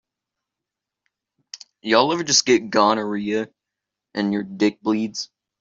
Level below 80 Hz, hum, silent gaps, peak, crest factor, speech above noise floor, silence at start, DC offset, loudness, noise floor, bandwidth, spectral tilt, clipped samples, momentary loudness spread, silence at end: -66 dBFS; none; none; -2 dBFS; 20 dB; 65 dB; 1.55 s; under 0.1%; -20 LUFS; -85 dBFS; 7.8 kHz; -3 dB/octave; under 0.1%; 18 LU; 0.35 s